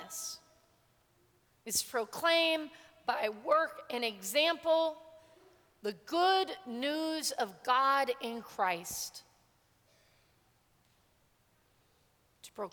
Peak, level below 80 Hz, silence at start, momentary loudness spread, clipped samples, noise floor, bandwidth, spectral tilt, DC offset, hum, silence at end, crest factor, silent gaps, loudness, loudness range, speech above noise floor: -14 dBFS; -76 dBFS; 0 s; 14 LU; under 0.1%; -71 dBFS; 19.5 kHz; -1.5 dB/octave; under 0.1%; none; 0.05 s; 20 dB; none; -33 LUFS; 9 LU; 38 dB